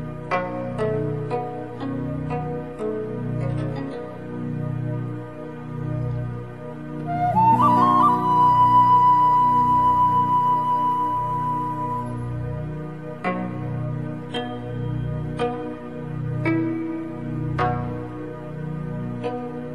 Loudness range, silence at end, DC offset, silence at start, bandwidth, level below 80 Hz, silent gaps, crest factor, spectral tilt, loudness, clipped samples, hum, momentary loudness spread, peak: 12 LU; 0 s; 0.5%; 0 s; 12 kHz; -46 dBFS; none; 16 dB; -8.5 dB/octave; -22 LUFS; under 0.1%; 60 Hz at -40 dBFS; 16 LU; -6 dBFS